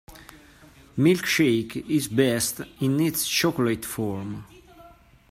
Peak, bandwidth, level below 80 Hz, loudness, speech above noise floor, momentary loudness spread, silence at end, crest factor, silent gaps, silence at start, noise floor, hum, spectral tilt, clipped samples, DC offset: -8 dBFS; 16 kHz; -56 dBFS; -24 LUFS; 28 dB; 10 LU; 0.45 s; 18 dB; none; 0.1 s; -51 dBFS; none; -4.5 dB/octave; under 0.1%; under 0.1%